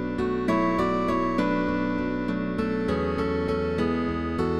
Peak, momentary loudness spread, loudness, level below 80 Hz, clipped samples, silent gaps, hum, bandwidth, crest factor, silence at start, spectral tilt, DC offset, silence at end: -12 dBFS; 4 LU; -26 LUFS; -42 dBFS; under 0.1%; none; none; 11.5 kHz; 14 dB; 0 s; -7.5 dB/octave; 0.4%; 0 s